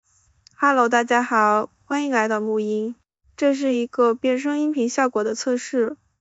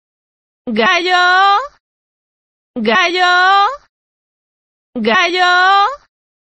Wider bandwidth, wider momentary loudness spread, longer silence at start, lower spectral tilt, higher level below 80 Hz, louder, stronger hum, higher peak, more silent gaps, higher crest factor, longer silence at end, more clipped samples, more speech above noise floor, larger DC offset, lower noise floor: about the same, 8.2 kHz vs 8.4 kHz; second, 7 LU vs 20 LU; about the same, 0.6 s vs 0.65 s; first, -4 dB/octave vs -2.5 dB/octave; second, -70 dBFS vs -60 dBFS; second, -21 LUFS vs -11 LUFS; neither; second, -6 dBFS vs 0 dBFS; second, none vs 1.80-2.74 s, 3.89-4.93 s; about the same, 16 dB vs 14 dB; second, 0.25 s vs 0.6 s; neither; second, 37 dB vs over 78 dB; neither; second, -57 dBFS vs under -90 dBFS